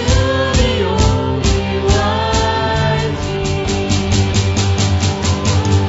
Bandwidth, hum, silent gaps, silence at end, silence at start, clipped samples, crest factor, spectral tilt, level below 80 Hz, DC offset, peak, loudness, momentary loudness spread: 8 kHz; none; none; 0 s; 0 s; under 0.1%; 14 dB; -5 dB/octave; -24 dBFS; under 0.1%; 0 dBFS; -15 LUFS; 3 LU